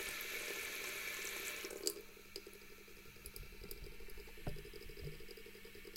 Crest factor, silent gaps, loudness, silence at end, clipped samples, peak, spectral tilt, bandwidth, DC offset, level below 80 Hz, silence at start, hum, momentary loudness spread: 30 dB; none; -46 LUFS; 0 s; under 0.1%; -18 dBFS; -2 dB/octave; 16.5 kHz; under 0.1%; -58 dBFS; 0 s; none; 13 LU